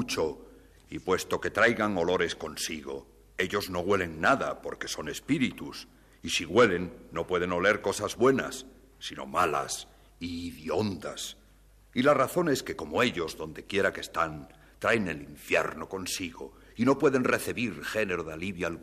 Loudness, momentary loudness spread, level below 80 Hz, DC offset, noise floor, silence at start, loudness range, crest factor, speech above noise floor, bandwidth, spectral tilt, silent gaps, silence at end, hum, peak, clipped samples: -29 LUFS; 15 LU; -56 dBFS; under 0.1%; -58 dBFS; 0 s; 3 LU; 18 dB; 29 dB; 15 kHz; -4 dB/octave; none; 0 s; none; -12 dBFS; under 0.1%